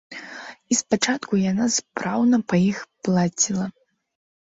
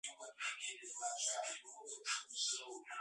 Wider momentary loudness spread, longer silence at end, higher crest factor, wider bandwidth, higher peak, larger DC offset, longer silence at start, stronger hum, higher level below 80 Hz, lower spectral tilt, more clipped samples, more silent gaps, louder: first, 14 LU vs 10 LU; first, 0.85 s vs 0 s; about the same, 18 dB vs 18 dB; second, 8 kHz vs 11.5 kHz; first, -6 dBFS vs -26 dBFS; neither; about the same, 0.1 s vs 0.05 s; neither; first, -60 dBFS vs under -90 dBFS; first, -4 dB/octave vs 4 dB/octave; neither; neither; first, -22 LUFS vs -42 LUFS